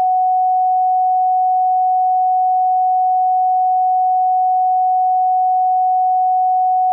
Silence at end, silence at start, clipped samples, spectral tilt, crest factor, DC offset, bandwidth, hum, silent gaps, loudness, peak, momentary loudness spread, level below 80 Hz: 0 s; 0 s; under 0.1%; -2.5 dB/octave; 4 dB; under 0.1%; 0.9 kHz; none; none; -15 LUFS; -12 dBFS; 0 LU; under -90 dBFS